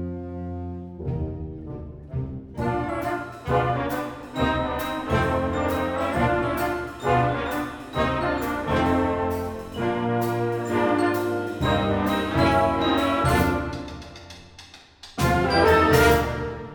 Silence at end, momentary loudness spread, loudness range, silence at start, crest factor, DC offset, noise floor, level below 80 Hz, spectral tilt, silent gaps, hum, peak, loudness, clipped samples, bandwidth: 0 s; 14 LU; 6 LU; 0 s; 20 dB; under 0.1%; -47 dBFS; -40 dBFS; -6 dB/octave; none; none; -4 dBFS; -24 LUFS; under 0.1%; over 20 kHz